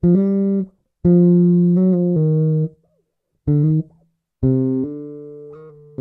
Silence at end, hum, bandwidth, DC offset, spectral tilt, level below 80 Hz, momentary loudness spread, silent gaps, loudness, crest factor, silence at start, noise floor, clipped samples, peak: 0.3 s; none; 2.1 kHz; under 0.1%; -14.5 dB/octave; -44 dBFS; 21 LU; none; -17 LUFS; 12 dB; 0.05 s; -69 dBFS; under 0.1%; -4 dBFS